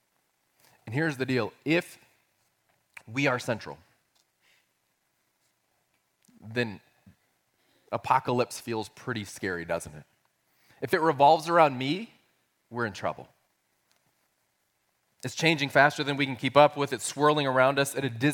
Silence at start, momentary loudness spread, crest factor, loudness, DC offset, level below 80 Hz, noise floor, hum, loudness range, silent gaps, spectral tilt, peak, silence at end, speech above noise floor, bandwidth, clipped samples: 0.85 s; 15 LU; 24 dB; -27 LUFS; under 0.1%; -70 dBFS; -75 dBFS; none; 15 LU; none; -5 dB/octave; -4 dBFS; 0 s; 48 dB; 17 kHz; under 0.1%